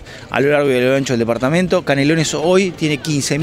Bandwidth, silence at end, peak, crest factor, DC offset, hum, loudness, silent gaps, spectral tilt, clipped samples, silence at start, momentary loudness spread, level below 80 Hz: 16 kHz; 0 s; 0 dBFS; 16 dB; under 0.1%; none; -16 LUFS; none; -5 dB/octave; under 0.1%; 0 s; 4 LU; -46 dBFS